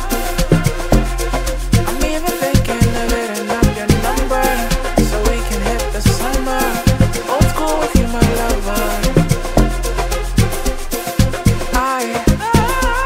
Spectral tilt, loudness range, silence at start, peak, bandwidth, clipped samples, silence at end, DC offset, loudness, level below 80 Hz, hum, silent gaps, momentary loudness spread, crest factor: -5 dB/octave; 1 LU; 0 s; 0 dBFS; 16.5 kHz; under 0.1%; 0 s; under 0.1%; -16 LUFS; -20 dBFS; none; none; 5 LU; 14 dB